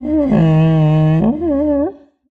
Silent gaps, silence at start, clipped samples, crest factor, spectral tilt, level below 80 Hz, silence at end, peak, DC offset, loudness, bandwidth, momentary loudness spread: none; 0 s; under 0.1%; 12 dB; -10.5 dB/octave; -38 dBFS; 0.4 s; -2 dBFS; under 0.1%; -14 LUFS; 3.9 kHz; 5 LU